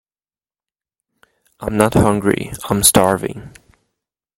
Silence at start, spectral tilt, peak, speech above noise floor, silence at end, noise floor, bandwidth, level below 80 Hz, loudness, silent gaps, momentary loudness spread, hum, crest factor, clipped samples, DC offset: 1.6 s; -4 dB/octave; 0 dBFS; over 74 dB; 0.9 s; under -90 dBFS; 16.5 kHz; -42 dBFS; -15 LUFS; none; 17 LU; none; 20 dB; under 0.1%; under 0.1%